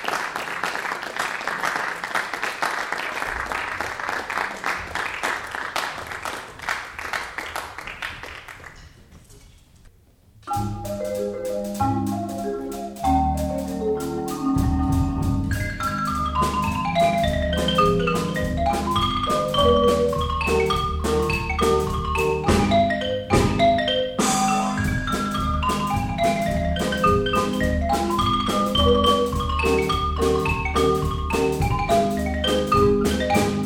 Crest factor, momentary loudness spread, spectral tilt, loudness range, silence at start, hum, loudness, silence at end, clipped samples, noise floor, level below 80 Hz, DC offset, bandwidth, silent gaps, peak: 16 dB; 9 LU; -5 dB/octave; 9 LU; 0 s; none; -23 LUFS; 0 s; under 0.1%; -53 dBFS; -34 dBFS; under 0.1%; 19.5 kHz; none; -6 dBFS